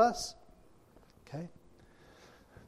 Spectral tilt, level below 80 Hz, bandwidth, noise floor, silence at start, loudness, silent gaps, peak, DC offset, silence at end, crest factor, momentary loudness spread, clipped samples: -4 dB/octave; -64 dBFS; 14 kHz; -61 dBFS; 0 s; -38 LUFS; none; -14 dBFS; under 0.1%; 1.2 s; 24 dB; 22 LU; under 0.1%